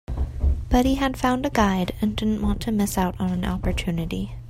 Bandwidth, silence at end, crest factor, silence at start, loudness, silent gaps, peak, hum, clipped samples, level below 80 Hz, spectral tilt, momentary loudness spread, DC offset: 16 kHz; 0 s; 16 dB; 0.1 s; -24 LUFS; none; -6 dBFS; none; under 0.1%; -30 dBFS; -6 dB/octave; 5 LU; under 0.1%